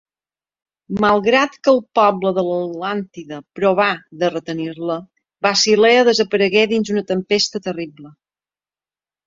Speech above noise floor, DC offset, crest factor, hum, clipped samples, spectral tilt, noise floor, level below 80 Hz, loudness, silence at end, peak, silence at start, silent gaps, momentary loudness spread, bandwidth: over 73 dB; under 0.1%; 18 dB; none; under 0.1%; -4 dB/octave; under -90 dBFS; -58 dBFS; -17 LUFS; 1.2 s; 0 dBFS; 0.9 s; none; 13 LU; 7.8 kHz